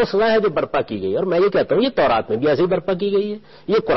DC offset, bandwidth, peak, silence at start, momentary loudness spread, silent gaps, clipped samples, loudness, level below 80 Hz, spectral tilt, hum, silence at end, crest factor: under 0.1%; 6 kHz; -8 dBFS; 0 s; 6 LU; none; under 0.1%; -19 LUFS; -48 dBFS; -4.5 dB/octave; none; 0 s; 10 dB